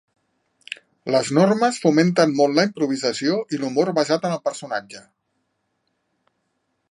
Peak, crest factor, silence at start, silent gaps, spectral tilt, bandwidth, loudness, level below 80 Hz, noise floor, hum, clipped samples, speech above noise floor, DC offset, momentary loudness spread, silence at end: -4 dBFS; 18 dB; 0.7 s; none; -5 dB/octave; 11.5 kHz; -20 LUFS; -72 dBFS; -73 dBFS; none; under 0.1%; 53 dB; under 0.1%; 12 LU; 1.9 s